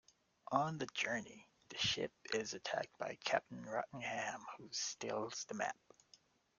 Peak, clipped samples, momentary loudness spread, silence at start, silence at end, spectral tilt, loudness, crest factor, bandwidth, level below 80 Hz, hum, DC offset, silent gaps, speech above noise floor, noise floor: -20 dBFS; under 0.1%; 10 LU; 0.5 s; 0.85 s; -2.5 dB/octave; -41 LUFS; 24 dB; 10 kHz; -78 dBFS; none; under 0.1%; none; 29 dB; -71 dBFS